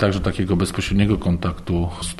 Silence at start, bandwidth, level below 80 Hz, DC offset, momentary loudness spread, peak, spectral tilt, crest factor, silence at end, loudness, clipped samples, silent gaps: 0 s; 12.5 kHz; -32 dBFS; under 0.1%; 5 LU; -4 dBFS; -6 dB/octave; 16 dB; 0 s; -21 LUFS; under 0.1%; none